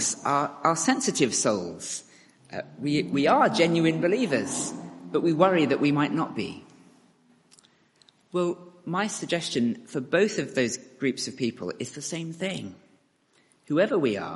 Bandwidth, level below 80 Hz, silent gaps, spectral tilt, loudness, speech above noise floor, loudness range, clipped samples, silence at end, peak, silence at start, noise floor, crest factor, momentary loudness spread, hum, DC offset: 11.5 kHz; -70 dBFS; none; -4 dB/octave; -26 LUFS; 40 dB; 8 LU; under 0.1%; 0 s; -6 dBFS; 0 s; -65 dBFS; 22 dB; 13 LU; none; under 0.1%